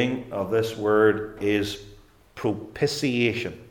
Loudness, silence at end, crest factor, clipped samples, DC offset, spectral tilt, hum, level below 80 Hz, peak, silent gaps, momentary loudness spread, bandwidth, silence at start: -25 LUFS; 0.05 s; 18 dB; under 0.1%; under 0.1%; -5.5 dB/octave; none; -54 dBFS; -6 dBFS; none; 10 LU; 17.5 kHz; 0 s